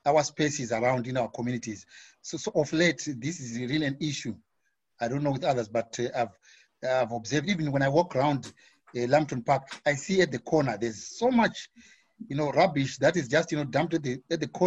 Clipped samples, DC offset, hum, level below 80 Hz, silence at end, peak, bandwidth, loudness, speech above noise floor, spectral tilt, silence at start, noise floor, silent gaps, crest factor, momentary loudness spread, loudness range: under 0.1%; under 0.1%; none; -62 dBFS; 0 s; -10 dBFS; 8.4 kHz; -28 LUFS; 51 dB; -5 dB/octave; 0.05 s; -79 dBFS; none; 18 dB; 11 LU; 4 LU